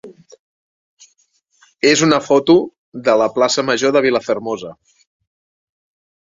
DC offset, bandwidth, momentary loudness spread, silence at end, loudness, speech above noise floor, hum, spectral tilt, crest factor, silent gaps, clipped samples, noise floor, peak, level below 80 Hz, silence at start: under 0.1%; 7.8 kHz; 13 LU; 1.5 s; -15 LUFS; 47 dB; none; -4 dB/octave; 18 dB; 0.39-0.97 s, 2.78-2.92 s; under 0.1%; -62 dBFS; 0 dBFS; -60 dBFS; 0.05 s